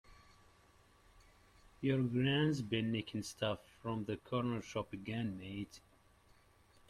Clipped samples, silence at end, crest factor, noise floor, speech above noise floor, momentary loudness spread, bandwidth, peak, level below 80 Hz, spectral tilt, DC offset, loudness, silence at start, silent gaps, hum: under 0.1%; 1.1 s; 18 dB; -67 dBFS; 29 dB; 11 LU; 14 kHz; -22 dBFS; -68 dBFS; -6 dB/octave; under 0.1%; -39 LUFS; 0.1 s; none; none